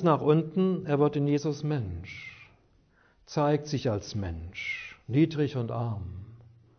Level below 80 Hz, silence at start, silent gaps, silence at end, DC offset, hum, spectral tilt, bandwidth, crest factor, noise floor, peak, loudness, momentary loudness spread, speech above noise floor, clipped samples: -54 dBFS; 0 s; none; 0.4 s; under 0.1%; none; -7.5 dB/octave; 6.6 kHz; 18 dB; -64 dBFS; -10 dBFS; -29 LUFS; 14 LU; 36 dB; under 0.1%